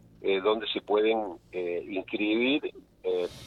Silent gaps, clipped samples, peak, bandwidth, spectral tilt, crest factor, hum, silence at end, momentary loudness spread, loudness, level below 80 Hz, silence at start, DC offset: none; under 0.1%; -12 dBFS; 10.5 kHz; -5.5 dB/octave; 16 dB; none; 0 s; 10 LU; -29 LUFS; -64 dBFS; 0.2 s; under 0.1%